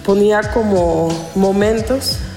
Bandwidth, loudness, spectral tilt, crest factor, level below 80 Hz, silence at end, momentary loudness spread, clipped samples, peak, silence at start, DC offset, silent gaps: 16.5 kHz; -15 LUFS; -5.5 dB/octave; 12 dB; -32 dBFS; 0 s; 5 LU; under 0.1%; -2 dBFS; 0 s; under 0.1%; none